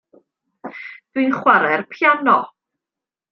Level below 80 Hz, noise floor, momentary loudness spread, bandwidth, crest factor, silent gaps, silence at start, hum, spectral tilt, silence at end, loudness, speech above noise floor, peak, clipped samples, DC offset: -72 dBFS; -87 dBFS; 20 LU; 6.4 kHz; 20 dB; none; 0.65 s; none; -6.5 dB/octave; 0.85 s; -16 LUFS; 71 dB; 0 dBFS; under 0.1%; under 0.1%